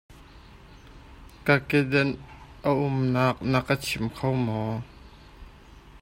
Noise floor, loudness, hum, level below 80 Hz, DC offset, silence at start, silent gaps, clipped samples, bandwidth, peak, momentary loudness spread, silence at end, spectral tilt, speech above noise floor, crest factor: -49 dBFS; -26 LUFS; none; -50 dBFS; under 0.1%; 0.1 s; none; under 0.1%; 16 kHz; -4 dBFS; 11 LU; 0.05 s; -6.5 dB/octave; 24 dB; 24 dB